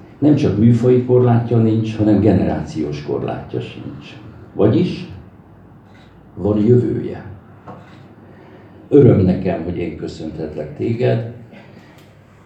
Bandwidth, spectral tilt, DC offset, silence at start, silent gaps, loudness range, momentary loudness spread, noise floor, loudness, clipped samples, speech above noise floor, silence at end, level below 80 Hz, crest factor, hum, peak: 7.8 kHz; -9.5 dB/octave; under 0.1%; 0 s; none; 7 LU; 20 LU; -44 dBFS; -16 LUFS; under 0.1%; 29 dB; 0.65 s; -46 dBFS; 18 dB; none; 0 dBFS